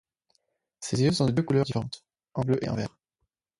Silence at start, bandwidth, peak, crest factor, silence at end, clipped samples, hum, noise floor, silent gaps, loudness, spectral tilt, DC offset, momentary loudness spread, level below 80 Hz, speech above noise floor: 0.8 s; 11.5 kHz; -10 dBFS; 18 dB; 0.7 s; under 0.1%; none; -81 dBFS; none; -27 LUFS; -6 dB/octave; under 0.1%; 15 LU; -56 dBFS; 55 dB